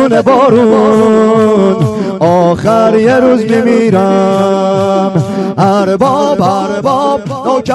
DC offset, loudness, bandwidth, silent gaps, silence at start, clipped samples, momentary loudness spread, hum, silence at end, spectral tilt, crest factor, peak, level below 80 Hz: under 0.1%; -9 LUFS; 12 kHz; none; 0 s; 1%; 6 LU; none; 0 s; -7 dB/octave; 8 dB; 0 dBFS; -46 dBFS